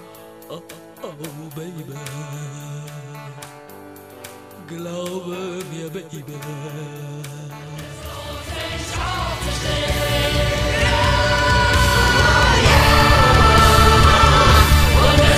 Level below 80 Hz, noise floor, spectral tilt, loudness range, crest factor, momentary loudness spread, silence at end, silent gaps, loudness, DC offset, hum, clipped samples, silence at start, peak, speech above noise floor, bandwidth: -24 dBFS; -40 dBFS; -4.5 dB/octave; 21 LU; 18 dB; 24 LU; 0 s; none; -15 LUFS; under 0.1%; none; under 0.1%; 0 s; 0 dBFS; 14 dB; 15.5 kHz